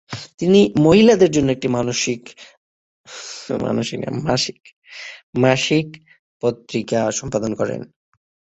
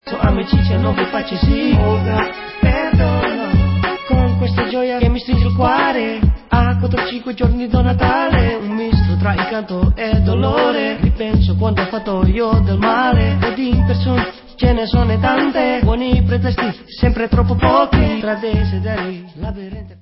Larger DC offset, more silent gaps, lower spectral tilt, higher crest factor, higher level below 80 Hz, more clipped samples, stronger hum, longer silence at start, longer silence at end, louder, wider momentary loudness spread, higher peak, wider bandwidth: neither; first, 2.57-3.04 s, 4.73-4.82 s, 5.23-5.33 s, 6.19-6.40 s vs none; second, -5 dB/octave vs -12 dB/octave; about the same, 18 dB vs 14 dB; second, -50 dBFS vs -20 dBFS; neither; neither; about the same, 0.1 s vs 0.05 s; first, 0.65 s vs 0.05 s; about the same, -18 LUFS vs -16 LUFS; first, 20 LU vs 6 LU; about the same, -2 dBFS vs 0 dBFS; first, 8.2 kHz vs 5.8 kHz